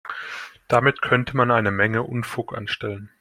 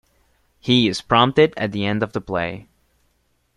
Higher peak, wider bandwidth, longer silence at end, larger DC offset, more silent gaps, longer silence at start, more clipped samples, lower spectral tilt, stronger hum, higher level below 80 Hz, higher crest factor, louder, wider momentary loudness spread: about the same, -2 dBFS vs -2 dBFS; first, 15.5 kHz vs 11.5 kHz; second, 0.15 s vs 0.95 s; neither; neither; second, 0.05 s vs 0.65 s; neither; about the same, -6.5 dB/octave vs -5.5 dB/octave; neither; about the same, -54 dBFS vs -52 dBFS; about the same, 20 dB vs 20 dB; second, -22 LUFS vs -19 LUFS; about the same, 13 LU vs 12 LU